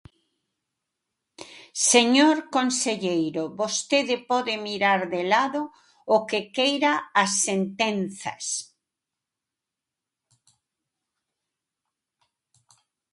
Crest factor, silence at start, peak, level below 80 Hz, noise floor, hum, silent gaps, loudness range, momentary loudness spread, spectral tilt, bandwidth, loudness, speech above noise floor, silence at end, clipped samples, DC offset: 24 dB; 1.4 s; -2 dBFS; -72 dBFS; -87 dBFS; none; none; 10 LU; 13 LU; -2.5 dB/octave; 11.5 kHz; -23 LUFS; 64 dB; 4.5 s; under 0.1%; under 0.1%